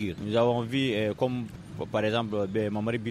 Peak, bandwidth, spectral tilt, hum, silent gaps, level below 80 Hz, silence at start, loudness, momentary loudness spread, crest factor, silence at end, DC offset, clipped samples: -12 dBFS; 13.5 kHz; -7 dB/octave; none; none; -58 dBFS; 0 s; -28 LUFS; 8 LU; 18 dB; 0 s; under 0.1%; under 0.1%